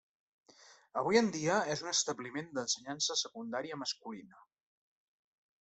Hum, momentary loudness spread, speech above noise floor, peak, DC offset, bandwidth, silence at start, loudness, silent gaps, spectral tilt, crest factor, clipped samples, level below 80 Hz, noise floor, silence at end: none; 12 LU; 26 dB; -14 dBFS; under 0.1%; 8.4 kHz; 0.7 s; -34 LUFS; none; -2.5 dB/octave; 24 dB; under 0.1%; -76 dBFS; -61 dBFS; 1.2 s